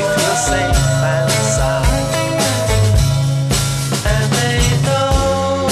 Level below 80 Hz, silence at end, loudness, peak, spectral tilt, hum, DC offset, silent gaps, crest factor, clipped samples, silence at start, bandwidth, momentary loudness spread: -22 dBFS; 0 s; -15 LUFS; -2 dBFS; -4.5 dB/octave; none; under 0.1%; none; 12 dB; under 0.1%; 0 s; 14 kHz; 2 LU